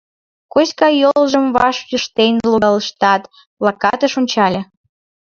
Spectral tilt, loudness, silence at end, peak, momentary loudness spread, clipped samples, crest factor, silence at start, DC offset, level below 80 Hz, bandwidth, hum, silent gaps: -4.5 dB/octave; -15 LUFS; 0.7 s; 0 dBFS; 7 LU; under 0.1%; 16 dB; 0.55 s; under 0.1%; -52 dBFS; 7.4 kHz; none; 3.47-3.57 s